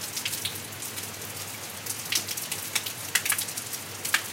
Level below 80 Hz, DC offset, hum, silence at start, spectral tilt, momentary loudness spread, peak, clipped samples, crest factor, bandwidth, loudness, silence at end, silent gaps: -70 dBFS; under 0.1%; none; 0 s; -0.5 dB/octave; 8 LU; -4 dBFS; under 0.1%; 28 dB; 17 kHz; -29 LUFS; 0 s; none